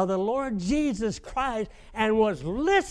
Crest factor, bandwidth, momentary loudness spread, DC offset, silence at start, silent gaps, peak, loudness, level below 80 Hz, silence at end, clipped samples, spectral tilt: 16 dB; 11 kHz; 7 LU; under 0.1%; 0 s; none; -10 dBFS; -27 LUFS; -46 dBFS; 0 s; under 0.1%; -5.5 dB/octave